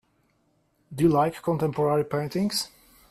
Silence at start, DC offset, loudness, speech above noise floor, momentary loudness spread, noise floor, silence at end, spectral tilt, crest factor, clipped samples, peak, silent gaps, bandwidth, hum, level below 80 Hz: 0.9 s; under 0.1%; -25 LUFS; 44 dB; 8 LU; -68 dBFS; 0.45 s; -6 dB/octave; 16 dB; under 0.1%; -10 dBFS; none; 15 kHz; none; -58 dBFS